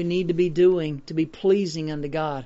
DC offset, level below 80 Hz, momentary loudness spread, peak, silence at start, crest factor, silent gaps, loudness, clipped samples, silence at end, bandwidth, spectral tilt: under 0.1%; -50 dBFS; 9 LU; -10 dBFS; 0 s; 14 dB; none; -23 LUFS; under 0.1%; 0 s; 8 kHz; -6.5 dB/octave